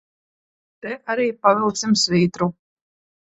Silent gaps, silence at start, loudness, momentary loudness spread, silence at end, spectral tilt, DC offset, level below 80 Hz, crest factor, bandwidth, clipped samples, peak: none; 0.85 s; -19 LUFS; 14 LU; 0.8 s; -4.5 dB/octave; under 0.1%; -62 dBFS; 22 dB; 8.4 kHz; under 0.1%; 0 dBFS